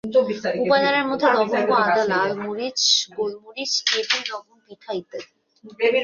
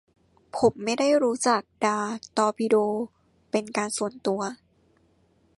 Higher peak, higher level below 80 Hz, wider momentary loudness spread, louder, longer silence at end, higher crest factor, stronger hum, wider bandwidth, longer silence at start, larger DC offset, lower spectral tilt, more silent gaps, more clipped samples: first, -4 dBFS vs -8 dBFS; about the same, -66 dBFS vs -66 dBFS; first, 13 LU vs 8 LU; first, -21 LUFS vs -25 LUFS; second, 0 s vs 1.05 s; about the same, 18 dB vs 18 dB; neither; second, 7.4 kHz vs 11.5 kHz; second, 0.05 s vs 0.55 s; neither; second, -2 dB/octave vs -4 dB/octave; neither; neither